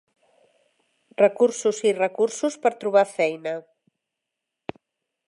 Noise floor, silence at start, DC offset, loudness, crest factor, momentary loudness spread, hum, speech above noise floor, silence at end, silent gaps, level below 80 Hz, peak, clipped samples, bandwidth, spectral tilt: -84 dBFS; 1.2 s; under 0.1%; -22 LUFS; 20 dB; 20 LU; none; 62 dB; 1.65 s; none; -74 dBFS; -6 dBFS; under 0.1%; 11.5 kHz; -4 dB/octave